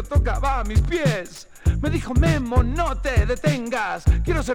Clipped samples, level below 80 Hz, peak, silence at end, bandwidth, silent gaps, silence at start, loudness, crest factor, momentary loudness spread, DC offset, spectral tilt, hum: under 0.1%; -24 dBFS; -4 dBFS; 0 s; 15 kHz; none; 0 s; -22 LUFS; 16 dB; 5 LU; under 0.1%; -6.5 dB/octave; none